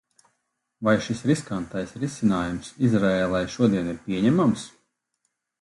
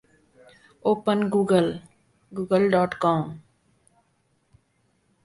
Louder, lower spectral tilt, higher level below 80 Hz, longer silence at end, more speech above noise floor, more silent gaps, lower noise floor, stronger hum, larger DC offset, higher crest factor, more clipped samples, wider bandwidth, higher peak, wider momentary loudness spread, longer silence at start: about the same, -24 LUFS vs -23 LUFS; about the same, -6.5 dB/octave vs -7 dB/octave; first, -52 dBFS vs -62 dBFS; second, 0.95 s vs 1.85 s; first, 54 dB vs 46 dB; neither; first, -77 dBFS vs -68 dBFS; neither; neither; about the same, 18 dB vs 20 dB; neither; about the same, 11.5 kHz vs 11.5 kHz; about the same, -8 dBFS vs -6 dBFS; second, 10 LU vs 16 LU; about the same, 0.8 s vs 0.85 s